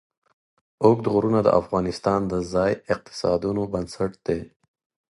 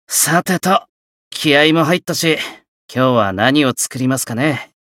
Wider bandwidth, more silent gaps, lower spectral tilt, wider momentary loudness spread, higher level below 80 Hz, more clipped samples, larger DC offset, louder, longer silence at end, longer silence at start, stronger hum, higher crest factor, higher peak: second, 11.5 kHz vs 17 kHz; second, none vs 0.89-1.31 s, 2.68-2.89 s; first, -7 dB/octave vs -3.5 dB/octave; about the same, 9 LU vs 8 LU; first, -50 dBFS vs -60 dBFS; neither; neither; second, -23 LUFS vs -15 LUFS; first, 0.7 s vs 0.2 s; first, 0.8 s vs 0.1 s; neither; first, 22 dB vs 16 dB; about the same, -2 dBFS vs 0 dBFS